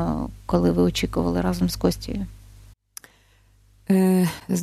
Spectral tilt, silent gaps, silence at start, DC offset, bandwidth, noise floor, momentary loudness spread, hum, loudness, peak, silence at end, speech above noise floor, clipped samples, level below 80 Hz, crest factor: -6.5 dB/octave; none; 0 s; under 0.1%; 14.5 kHz; -57 dBFS; 23 LU; 50 Hz at -40 dBFS; -23 LUFS; -4 dBFS; 0 s; 36 dB; under 0.1%; -38 dBFS; 20 dB